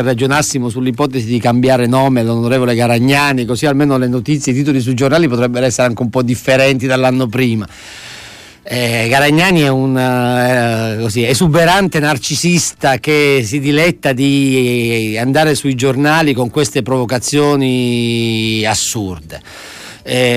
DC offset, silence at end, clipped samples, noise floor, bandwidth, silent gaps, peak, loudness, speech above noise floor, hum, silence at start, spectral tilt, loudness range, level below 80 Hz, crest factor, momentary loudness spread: under 0.1%; 0 s; under 0.1%; -35 dBFS; 15.5 kHz; none; -2 dBFS; -13 LUFS; 22 dB; none; 0 s; -5 dB/octave; 2 LU; -44 dBFS; 12 dB; 7 LU